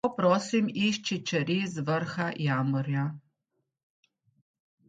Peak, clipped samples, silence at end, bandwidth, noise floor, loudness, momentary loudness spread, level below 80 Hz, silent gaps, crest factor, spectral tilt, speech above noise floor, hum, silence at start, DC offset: -10 dBFS; under 0.1%; 1.7 s; 9.2 kHz; -81 dBFS; -29 LUFS; 6 LU; -70 dBFS; none; 20 dB; -5.5 dB/octave; 53 dB; none; 0.05 s; under 0.1%